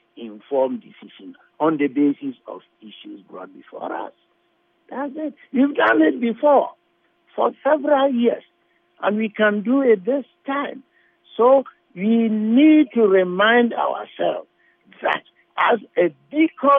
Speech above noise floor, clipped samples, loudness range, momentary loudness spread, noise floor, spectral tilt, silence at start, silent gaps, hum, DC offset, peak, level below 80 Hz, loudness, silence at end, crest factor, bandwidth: 46 dB; under 0.1%; 9 LU; 21 LU; -65 dBFS; -8.5 dB/octave; 0.15 s; none; none; under 0.1%; -4 dBFS; -80 dBFS; -19 LUFS; 0 s; 16 dB; 3.8 kHz